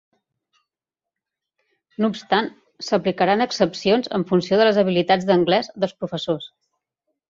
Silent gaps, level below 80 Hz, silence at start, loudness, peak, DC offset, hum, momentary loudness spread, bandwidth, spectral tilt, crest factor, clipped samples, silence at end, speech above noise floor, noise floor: none; -62 dBFS; 2 s; -20 LUFS; -4 dBFS; under 0.1%; none; 11 LU; 7.6 kHz; -5.5 dB/octave; 18 dB; under 0.1%; 0.85 s; 68 dB; -88 dBFS